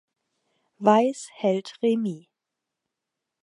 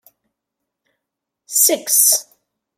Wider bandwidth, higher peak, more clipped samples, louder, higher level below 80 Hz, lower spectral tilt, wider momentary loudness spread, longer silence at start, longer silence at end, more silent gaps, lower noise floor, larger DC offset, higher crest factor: second, 11 kHz vs 16.5 kHz; second, -4 dBFS vs 0 dBFS; neither; second, -24 LUFS vs -13 LUFS; about the same, -82 dBFS vs -84 dBFS; first, -6 dB/octave vs 1.5 dB/octave; first, 10 LU vs 7 LU; second, 0.8 s vs 1.5 s; first, 1.25 s vs 0.55 s; neither; first, -85 dBFS vs -81 dBFS; neither; about the same, 22 dB vs 20 dB